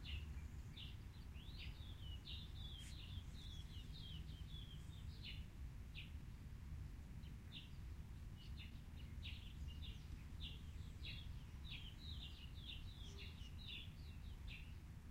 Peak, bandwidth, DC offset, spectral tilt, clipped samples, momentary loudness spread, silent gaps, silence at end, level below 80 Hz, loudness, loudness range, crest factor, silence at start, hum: -38 dBFS; 16 kHz; under 0.1%; -5 dB/octave; under 0.1%; 4 LU; none; 0 s; -56 dBFS; -55 LUFS; 2 LU; 14 dB; 0 s; none